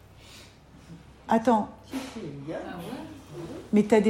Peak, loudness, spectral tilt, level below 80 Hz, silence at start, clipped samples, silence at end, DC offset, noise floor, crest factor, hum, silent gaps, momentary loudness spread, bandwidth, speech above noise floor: -8 dBFS; -29 LUFS; -6.5 dB/octave; -58 dBFS; 0.25 s; under 0.1%; 0 s; under 0.1%; -51 dBFS; 20 dB; none; none; 25 LU; 15 kHz; 27 dB